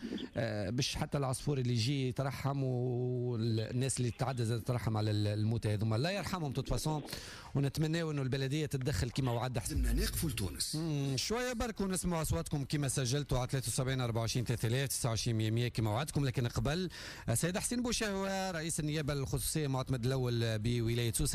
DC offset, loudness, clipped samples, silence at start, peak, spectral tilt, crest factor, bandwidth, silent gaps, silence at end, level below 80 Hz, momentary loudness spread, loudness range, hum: under 0.1%; -35 LUFS; under 0.1%; 0 s; -22 dBFS; -5 dB/octave; 12 dB; 15.5 kHz; none; 0 s; -48 dBFS; 3 LU; 1 LU; none